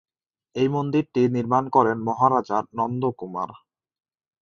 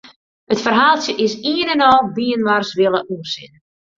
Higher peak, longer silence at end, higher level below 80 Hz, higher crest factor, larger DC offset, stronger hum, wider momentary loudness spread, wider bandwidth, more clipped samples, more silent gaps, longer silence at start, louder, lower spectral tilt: about the same, -4 dBFS vs -2 dBFS; first, 0.85 s vs 0.5 s; second, -64 dBFS vs -56 dBFS; about the same, 20 dB vs 16 dB; neither; neither; about the same, 11 LU vs 12 LU; about the same, 7 kHz vs 7.6 kHz; neither; second, none vs 0.16-0.47 s; first, 0.55 s vs 0.05 s; second, -23 LUFS vs -16 LUFS; first, -8 dB/octave vs -4 dB/octave